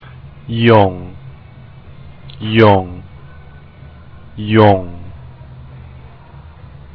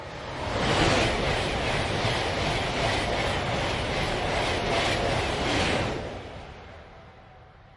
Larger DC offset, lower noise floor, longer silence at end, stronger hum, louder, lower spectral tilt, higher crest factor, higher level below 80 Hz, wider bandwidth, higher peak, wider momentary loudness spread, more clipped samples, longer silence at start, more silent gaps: neither; second, -37 dBFS vs -50 dBFS; first, 1.05 s vs 0.15 s; neither; first, -12 LUFS vs -26 LUFS; first, -9.5 dB/octave vs -4.5 dB/octave; about the same, 16 dB vs 18 dB; about the same, -42 dBFS vs -40 dBFS; second, 5.4 kHz vs 11.5 kHz; first, 0 dBFS vs -10 dBFS; first, 26 LU vs 14 LU; first, 0.1% vs under 0.1%; first, 0.25 s vs 0 s; neither